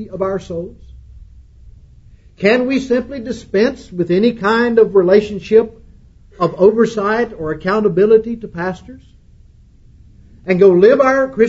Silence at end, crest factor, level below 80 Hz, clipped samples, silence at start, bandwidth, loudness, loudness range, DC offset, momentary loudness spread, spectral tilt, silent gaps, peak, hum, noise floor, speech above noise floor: 0 s; 16 dB; -44 dBFS; under 0.1%; 0 s; 8 kHz; -14 LUFS; 5 LU; under 0.1%; 15 LU; -7 dB/octave; none; 0 dBFS; none; -45 dBFS; 31 dB